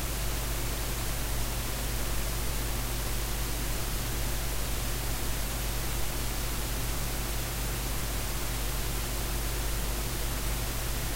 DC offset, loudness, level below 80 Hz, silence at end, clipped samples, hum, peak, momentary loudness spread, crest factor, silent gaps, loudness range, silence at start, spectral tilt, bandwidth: under 0.1%; -32 LUFS; -34 dBFS; 0 s; under 0.1%; none; -18 dBFS; 0 LU; 14 dB; none; 0 LU; 0 s; -3.5 dB/octave; 16 kHz